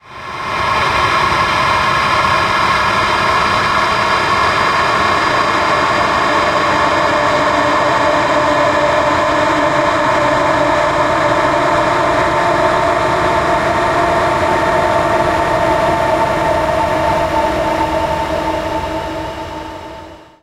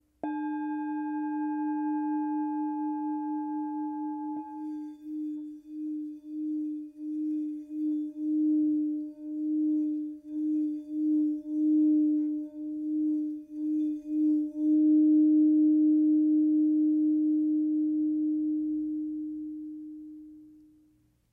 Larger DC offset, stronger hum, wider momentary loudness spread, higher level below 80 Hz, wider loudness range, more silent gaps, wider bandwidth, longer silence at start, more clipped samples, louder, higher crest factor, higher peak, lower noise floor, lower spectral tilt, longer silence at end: neither; neither; second, 5 LU vs 14 LU; first, -34 dBFS vs -74 dBFS; second, 2 LU vs 11 LU; neither; first, 15.5 kHz vs 2.6 kHz; second, 0.05 s vs 0.25 s; neither; first, -13 LUFS vs -29 LUFS; about the same, 14 dB vs 12 dB; first, 0 dBFS vs -18 dBFS; second, -34 dBFS vs -66 dBFS; second, -4.5 dB/octave vs -8.5 dB/octave; second, 0.2 s vs 0.8 s